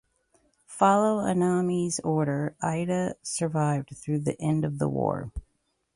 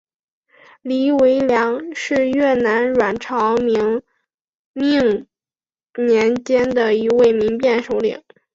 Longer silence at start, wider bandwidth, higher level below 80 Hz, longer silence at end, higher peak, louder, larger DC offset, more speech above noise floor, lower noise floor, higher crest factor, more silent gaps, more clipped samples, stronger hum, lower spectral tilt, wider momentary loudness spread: second, 0.7 s vs 0.85 s; first, 11.5 kHz vs 7.8 kHz; about the same, -52 dBFS vs -54 dBFS; first, 0.55 s vs 0.35 s; second, -8 dBFS vs -4 dBFS; second, -27 LUFS vs -17 LUFS; neither; second, 48 dB vs over 74 dB; second, -74 dBFS vs under -90 dBFS; first, 20 dB vs 14 dB; second, none vs 4.34-4.74 s; neither; neither; about the same, -6.5 dB/octave vs -5.5 dB/octave; about the same, 9 LU vs 9 LU